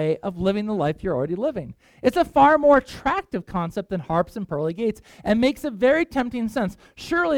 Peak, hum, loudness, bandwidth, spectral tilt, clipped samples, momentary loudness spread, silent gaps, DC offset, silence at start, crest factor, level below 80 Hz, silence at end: -6 dBFS; none; -22 LUFS; 17 kHz; -6.5 dB/octave; under 0.1%; 11 LU; none; under 0.1%; 0 s; 16 dB; -48 dBFS; 0 s